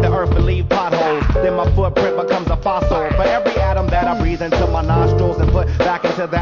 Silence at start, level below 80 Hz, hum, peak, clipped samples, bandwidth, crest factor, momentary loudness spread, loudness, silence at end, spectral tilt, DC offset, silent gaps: 0 s; -20 dBFS; none; -2 dBFS; under 0.1%; 7 kHz; 12 dB; 3 LU; -17 LUFS; 0 s; -7.5 dB/octave; under 0.1%; none